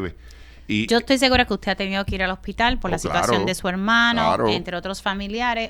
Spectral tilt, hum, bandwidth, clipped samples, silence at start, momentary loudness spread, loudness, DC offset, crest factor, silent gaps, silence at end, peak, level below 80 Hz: -4 dB/octave; none; 19 kHz; under 0.1%; 0 s; 9 LU; -21 LUFS; under 0.1%; 18 dB; none; 0 s; -4 dBFS; -38 dBFS